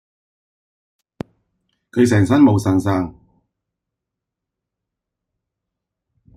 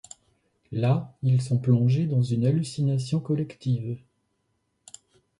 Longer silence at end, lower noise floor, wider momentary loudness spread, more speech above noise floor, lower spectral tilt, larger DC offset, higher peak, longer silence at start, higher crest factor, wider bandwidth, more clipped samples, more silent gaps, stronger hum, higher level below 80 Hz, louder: first, 3.25 s vs 1.4 s; first, -83 dBFS vs -74 dBFS; first, 23 LU vs 8 LU; first, 68 dB vs 50 dB; about the same, -7.5 dB/octave vs -8 dB/octave; neither; first, -2 dBFS vs -8 dBFS; first, 1.95 s vs 0.7 s; about the same, 18 dB vs 16 dB; first, 13.5 kHz vs 11 kHz; neither; neither; neither; first, -54 dBFS vs -62 dBFS; first, -16 LUFS vs -25 LUFS